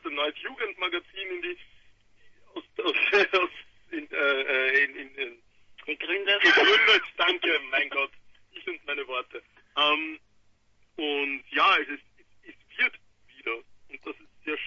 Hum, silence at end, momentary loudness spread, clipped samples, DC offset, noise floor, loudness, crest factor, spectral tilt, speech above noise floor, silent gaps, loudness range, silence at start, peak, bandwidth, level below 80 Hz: none; 0 s; 21 LU; under 0.1%; under 0.1%; -63 dBFS; -25 LUFS; 22 dB; -2 dB/octave; 36 dB; none; 7 LU; 0.05 s; -8 dBFS; 7.6 kHz; -70 dBFS